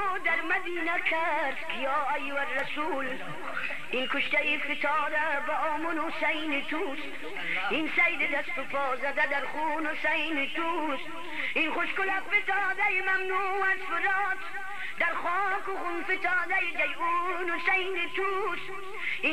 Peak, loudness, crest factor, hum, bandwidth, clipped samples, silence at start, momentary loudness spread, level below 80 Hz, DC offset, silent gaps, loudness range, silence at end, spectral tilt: -14 dBFS; -29 LUFS; 16 dB; none; 13.5 kHz; under 0.1%; 0 s; 7 LU; -72 dBFS; 2%; none; 2 LU; 0 s; -3.5 dB/octave